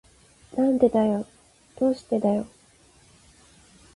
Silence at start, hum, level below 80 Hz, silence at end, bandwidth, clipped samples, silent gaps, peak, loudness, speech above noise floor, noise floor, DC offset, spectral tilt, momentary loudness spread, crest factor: 0.55 s; none; -60 dBFS; 1.5 s; 11.5 kHz; under 0.1%; none; -6 dBFS; -24 LUFS; 34 dB; -57 dBFS; under 0.1%; -7.5 dB/octave; 14 LU; 20 dB